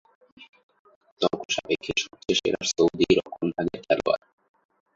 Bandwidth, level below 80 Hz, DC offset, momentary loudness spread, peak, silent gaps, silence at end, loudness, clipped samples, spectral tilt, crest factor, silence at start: 7.8 kHz; -56 dBFS; under 0.1%; 6 LU; -6 dBFS; 0.49-0.53 s, 0.63-0.69 s, 0.79-0.85 s, 0.96-1.01 s, 1.12-1.17 s, 1.45-1.49 s; 0.8 s; -25 LUFS; under 0.1%; -3.5 dB/octave; 20 dB; 0.4 s